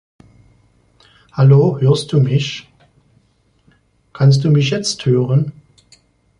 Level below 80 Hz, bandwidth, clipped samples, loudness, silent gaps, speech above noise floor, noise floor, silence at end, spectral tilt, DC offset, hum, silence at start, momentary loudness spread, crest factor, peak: -52 dBFS; 10.5 kHz; under 0.1%; -14 LUFS; none; 45 dB; -58 dBFS; 0.9 s; -6.5 dB/octave; under 0.1%; 60 Hz at -50 dBFS; 1.35 s; 13 LU; 14 dB; -2 dBFS